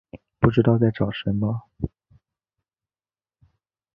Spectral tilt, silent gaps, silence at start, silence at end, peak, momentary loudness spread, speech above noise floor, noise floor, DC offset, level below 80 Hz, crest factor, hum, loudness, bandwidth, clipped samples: -10.5 dB/octave; none; 0.15 s; 2.1 s; -2 dBFS; 15 LU; over 69 dB; under -90 dBFS; under 0.1%; -46 dBFS; 24 dB; none; -23 LUFS; 5.2 kHz; under 0.1%